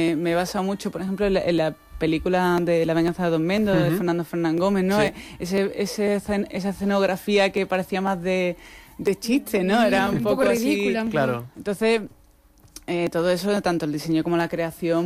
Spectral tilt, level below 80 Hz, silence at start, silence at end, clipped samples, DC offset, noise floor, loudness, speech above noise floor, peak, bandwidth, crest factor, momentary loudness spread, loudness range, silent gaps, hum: -6 dB/octave; -48 dBFS; 0 s; 0 s; under 0.1%; under 0.1%; -54 dBFS; -23 LUFS; 32 dB; -10 dBFS; 16 kHz; 12 dB; 7 LU; 3 LU; none; none